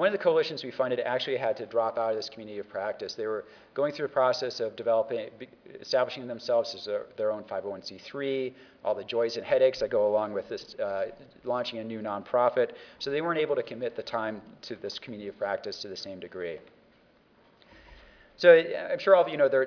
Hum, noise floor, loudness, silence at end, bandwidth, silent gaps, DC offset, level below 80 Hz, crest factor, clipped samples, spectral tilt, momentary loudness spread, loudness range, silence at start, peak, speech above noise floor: none; -62 dBFS; -29 LUFS; 0 s; 5.4 kHz; none; under 0.1%; -68 dBFS; 24 dB; under 0.1%; -5 dB/octave; 14 LU; 8 LU; 0 s; -6 dBFS; 33 dB